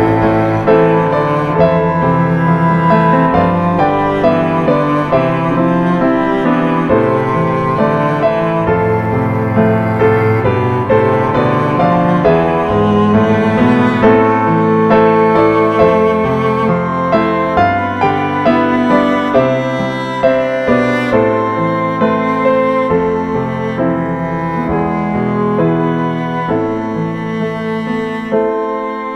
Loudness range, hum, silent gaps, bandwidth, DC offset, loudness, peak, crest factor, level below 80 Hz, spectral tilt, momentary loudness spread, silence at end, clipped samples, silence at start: 5 LU; none; none; 8.2 kHz; under 0.1%; -13 LUFS; 0 dBFS; 12 dB; -40 dBFS; -8.5 dB/octave; 6 LU; 0 s; under 0.1%; 0 s